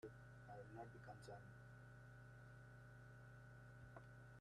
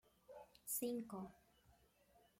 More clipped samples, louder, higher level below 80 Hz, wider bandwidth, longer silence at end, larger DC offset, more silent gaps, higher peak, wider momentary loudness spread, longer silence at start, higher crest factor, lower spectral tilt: neither; second, -61 LUFS vs -46 LUFS; first, -74 dBFS vs -80 dBFS; second, 12 kHz vs 16.5 kHz; second, 0 s vs 0.2 s; neither; neither; second, -44 dBFS vs -32 dBFS; second, 4 LU vs 19 LU; second, 0 s vs 0.3 s; about the same, 16 dB vs 18 dB; first, -6.5 dB/octave vs -4 dB/octave